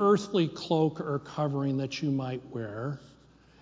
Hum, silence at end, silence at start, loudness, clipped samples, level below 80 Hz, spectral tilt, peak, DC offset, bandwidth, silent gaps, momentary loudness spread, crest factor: none; 0.55 s; 0 s; -30 LUFS; under 0.1%; -66 dBFS; -7 dB/octave; -12 dBFS; under 0.1%; 7.8 kHz; none; 10 LU; 18 dB